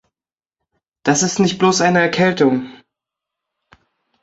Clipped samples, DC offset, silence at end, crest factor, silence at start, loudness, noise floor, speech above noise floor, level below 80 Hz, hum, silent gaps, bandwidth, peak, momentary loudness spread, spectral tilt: under 0.1%; under 0.1%; 1.5 s; 18 dB; 1.05 s; -16 LUFS; under -90 dBFS; over 75 dB; -58 dBFS; none; none; 8 kHz; -2 dBFS; 9 LU; -4 dB/octave